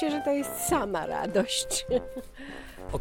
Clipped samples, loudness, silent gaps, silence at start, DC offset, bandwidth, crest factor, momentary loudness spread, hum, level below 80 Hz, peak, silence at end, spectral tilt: under 0.1%; -28 LUFS; none; 0 s; under 0.1%; 17.5 kHz; 18 dB; 16 LU; none; -48 dBFS; -12 dBFS; 0 s; -3.5 dB/octave